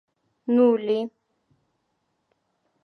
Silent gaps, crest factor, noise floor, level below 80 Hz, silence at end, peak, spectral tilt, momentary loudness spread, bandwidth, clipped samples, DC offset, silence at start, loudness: none; 18 dB; -74 dBFS; -82 dBFS; 1.75 s; -8 dBFS; -8 dB/octave; 17 LU; 4.9 kHz; under 0.1%; under 0.1%; 0.5 s; -22 LUFS